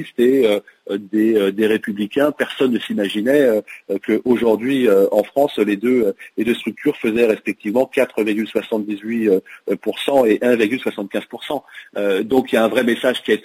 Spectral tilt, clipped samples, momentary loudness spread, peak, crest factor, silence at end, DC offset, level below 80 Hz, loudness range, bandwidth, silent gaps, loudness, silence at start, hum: -5.5 dB/octave; under 0.1%; 8 LU; -2 dBFS; 14 dB; 0.05 s; under 0.1%; -62 dBFS; 2 LU; 16 kHz; none; -18 LUFS; 0 s; none